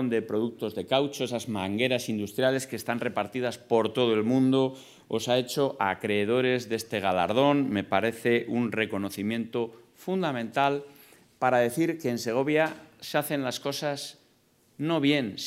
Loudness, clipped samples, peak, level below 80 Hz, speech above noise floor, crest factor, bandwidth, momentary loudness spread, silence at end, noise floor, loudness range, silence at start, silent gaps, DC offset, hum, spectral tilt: -27 LUFS; under 0.1%; -8 dBFS; -74 dBFS; 37 dB; 20 dB; 16 kHz; 8 LU; 0 s; -64 dBFS; 3 LU; 0 s; none; under 0.1%; none; -5 dB/octave